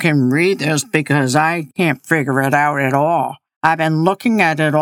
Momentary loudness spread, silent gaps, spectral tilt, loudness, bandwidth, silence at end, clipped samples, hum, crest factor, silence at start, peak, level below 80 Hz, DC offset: 4 LU; 3.56-3.61 s; -5.5 dB/octave; -16 LUFS; 17.5 kHz; 0 s; under 0.1%; none; 16 dB; 0 s; 0 dBFS; -66 dBFS; under 0.1%